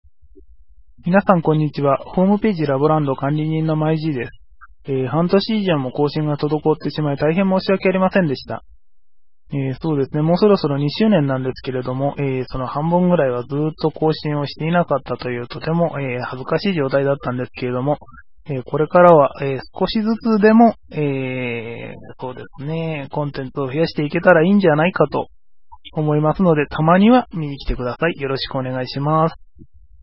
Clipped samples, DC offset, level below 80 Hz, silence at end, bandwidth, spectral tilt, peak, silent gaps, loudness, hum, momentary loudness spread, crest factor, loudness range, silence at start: under 0.1%; 0.7%; -44 dBFS; 0.7 s; 5.8 kHz; -10.5 dB/octave; 0 dBFS; none; -18 LUFS; none; 12 LU; 18 dB; 5 LU; 1.05 s